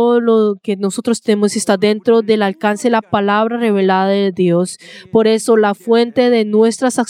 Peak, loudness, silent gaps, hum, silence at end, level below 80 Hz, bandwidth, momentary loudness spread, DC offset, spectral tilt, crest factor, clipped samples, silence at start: 0 dBFS; -14 LUFS; none; none; 0.05 s; -62 dBFS; 14.5 kHz; 5 LU; under 0.1%; -5 dB/octave; 12 dB; under 0.1%; 0 s